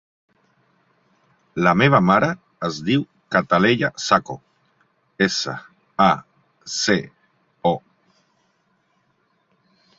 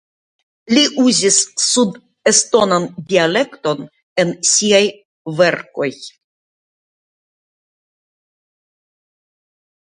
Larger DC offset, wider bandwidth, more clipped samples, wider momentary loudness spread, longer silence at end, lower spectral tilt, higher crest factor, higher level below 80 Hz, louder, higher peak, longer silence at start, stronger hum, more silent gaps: neither; second, 8 kHz vs 11 kHz; neither; first, 18 LU vs 11 LU; second, 2.2 s vs 3.85 s; first, -5 dB/octave vs -2.5 dB/octave; about the same, 22 dB vs 18 dB; first, -56 dBFS vs -64 dBFS; second, -20 LUFS vs -15 LUFS; about the same, -2 dBFS vs 0 dBFS; first, 1.55 s vs 0.7 s; neither; second, none vs 4.03-4.16 s, 5.05-5.25 s